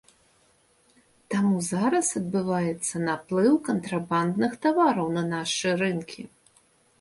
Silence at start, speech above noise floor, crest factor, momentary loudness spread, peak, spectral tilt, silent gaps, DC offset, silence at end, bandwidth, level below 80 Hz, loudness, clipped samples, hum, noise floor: 1.3 s; 38 dB; 16 dB; 7 LU; -10 dBFS; -5 dB/octave; none; under 0.1%; 0.75 s; 11.5 kHz; -66 dBFS; -25 LUFS; under 0.1%; none; -63 dBFS